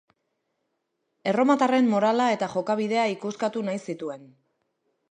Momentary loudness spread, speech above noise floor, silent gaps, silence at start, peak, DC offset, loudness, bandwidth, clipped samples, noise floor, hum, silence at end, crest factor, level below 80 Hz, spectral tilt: 13 LU; 54 dB; none; 1.25 s; -8 dBFS; under 0.1%; -24 LUFS; 9.6 kHz; under 0.1%; -77 dBFS; none; 0.85 s; 18 dB; -78 dBFS; -5.5 dB/octave